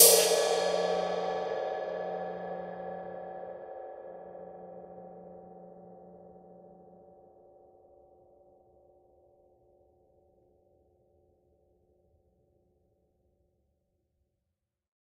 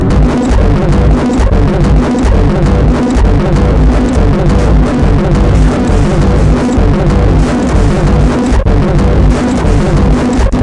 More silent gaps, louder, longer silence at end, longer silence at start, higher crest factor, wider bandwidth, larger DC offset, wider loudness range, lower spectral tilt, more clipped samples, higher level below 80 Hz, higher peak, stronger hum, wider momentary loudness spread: neither; second, -30 LUFS vs -10 LUFS; first, 8.4 s vs 0 s; about the same, 0 s vs 0 s; first, 30 dB vs 8 dB; first, 14.5 kHz vs 10.5 kHz; neither; first, 25 LU vs 0 LU; second, -1 dB/octave vs -7.5 dB/octave; neither; second, -74 dBFS vs -10 dBFS; second, -4 dBFS vs 0 dBFS; neither; first, 25 LU vs 1 LU